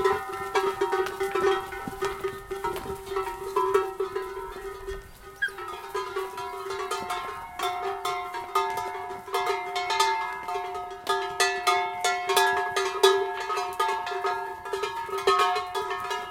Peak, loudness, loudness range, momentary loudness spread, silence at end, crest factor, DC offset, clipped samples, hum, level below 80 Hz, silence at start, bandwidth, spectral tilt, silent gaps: -6 dBFS; -28 LUFS; 7 LU; 12 LU; 0 s; 24 dB; under 0.1%; under 0.1%; none; -54 dBFS; 0 s; 17 kHz; -2 dB/octave; none